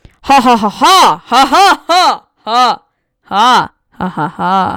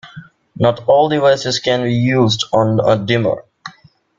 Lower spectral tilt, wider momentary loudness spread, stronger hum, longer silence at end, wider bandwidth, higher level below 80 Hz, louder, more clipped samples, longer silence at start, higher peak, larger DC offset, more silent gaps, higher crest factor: second, -3 dB/octave vs -5.5 dB/octave; first, 14 LU vs 11 LU; neither; second, 0 s vs 0.5 s; first, 19 kHz vs 7.6 kHz; first, -44 dBFS vs -50 dBFS; first, -9 LUFS vs -15 LUFS; neither; first, 0.25 s vs 0.05 s; about the same, -2 dBFS vs -2 dBFS; neither; neither; second, 8 dB vs 14 dB